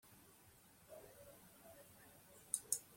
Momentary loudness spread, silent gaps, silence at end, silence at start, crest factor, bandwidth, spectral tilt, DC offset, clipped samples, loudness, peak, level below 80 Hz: 23 LU; none; 0 s; 0.05 s; 32 dB; 16.5 kHz; -1 dB/octave; under 0.1%; under 0.1%; -46 LUFS; -22 dBFS; -82 dBFS